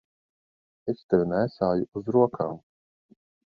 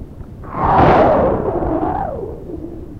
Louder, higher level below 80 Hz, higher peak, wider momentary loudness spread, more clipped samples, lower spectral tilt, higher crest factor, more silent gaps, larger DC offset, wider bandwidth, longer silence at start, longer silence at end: second, -26 LUFS vs -15 LUFS; second, -60 dBFS vs -30 dBFS; second, -6 dBFS vs 0 dBFS; second, 11 LU vs 19 LU; neither; about the same, -10 dB/octave vs -9 dB/octave; first, 22 dB vs 16 dB; first, 1.04-1.09 s, 1.88-1.92 s vs none; neither; second, 5.2 kHz vs 7.6 kHz; first, 0.85 s vs 0 s; first, 1 s vs 0 s